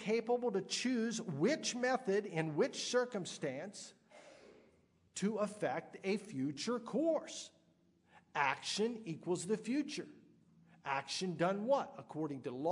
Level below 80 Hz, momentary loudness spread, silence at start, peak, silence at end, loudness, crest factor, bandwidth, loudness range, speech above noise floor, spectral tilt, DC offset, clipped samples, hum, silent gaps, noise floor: -86 dBFS; 11 LU; 0 s; -18 dBFS; 0 s; -38 LUFS; 20 dB; 11 kHz; 5 LU; 35 dB; -4.5 dB/octave; under 0.1%; under 0.1%; none; none; -72 dBFS